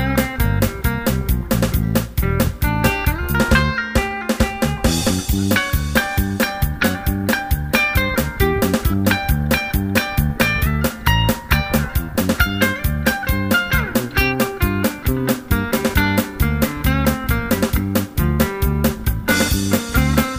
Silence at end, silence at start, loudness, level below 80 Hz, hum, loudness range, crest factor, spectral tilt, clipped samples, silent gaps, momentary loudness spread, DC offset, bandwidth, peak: 0 s; 0 s; -18 LUFS; -24 dBFS; none; 1 LU; 18 dB; -5 dB/octave; under 0.1%; none; 4 LU; under 0.1%; 16 kHz; 0 dBFS